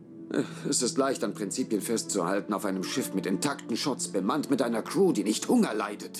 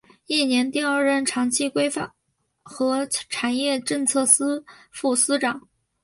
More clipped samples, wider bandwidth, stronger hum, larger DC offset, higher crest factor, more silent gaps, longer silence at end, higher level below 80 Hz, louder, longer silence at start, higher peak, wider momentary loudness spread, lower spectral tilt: neither; first, 15.5 kHz vs 12 kHz; neither; neither; second, 16 dB vs 22 dB; neither; second, 0 s vs 0.45 s; second, -78 dBFS vs -68 dBFS; second, -28 LUFS vs -22 LUFS; second, 0 s vs 0.3 s; second, -12 dBFS vs -2 dBFS; second, 6 LU vs 10 LU; first, -4 dB/octave vs -1.5 dB/octave